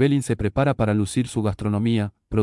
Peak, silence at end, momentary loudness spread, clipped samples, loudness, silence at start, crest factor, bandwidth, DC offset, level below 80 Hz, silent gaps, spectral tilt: -8 dBFS; 0 s; 4 LU; under 0.1%; -23 LUFS; 0 s; 14 dB; 12 kHz; under 0.1%; -44 dBFS; none; -7 dB/octave